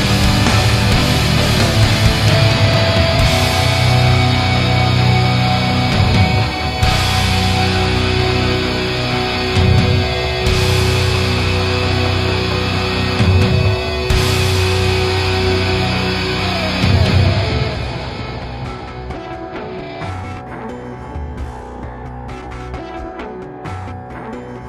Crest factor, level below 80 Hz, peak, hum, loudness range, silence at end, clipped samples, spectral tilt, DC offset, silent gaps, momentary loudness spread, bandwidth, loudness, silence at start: 16 dB; -26 dBFS; 0 dBFS; none; 15 LU; 0 s; under 0.1%; -5 dB/octave; under 0.1%; none; 15 LU; 15.5 kHz; -14 LUFS; 0 s